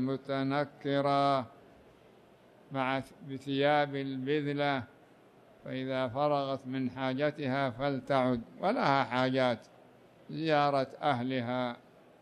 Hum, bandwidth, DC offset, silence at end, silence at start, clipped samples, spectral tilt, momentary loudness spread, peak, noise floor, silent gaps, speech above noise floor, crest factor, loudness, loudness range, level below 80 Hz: none; 10.5 kHz; under 0.1%; 0.45 s; 0 s; under 0.1%; -7 dB/octave; 11 LU; -14 dBFS; -60 dBFS; none; 28 dB; 18 dB; -32 LUFS; 3 LU; -70 dBFS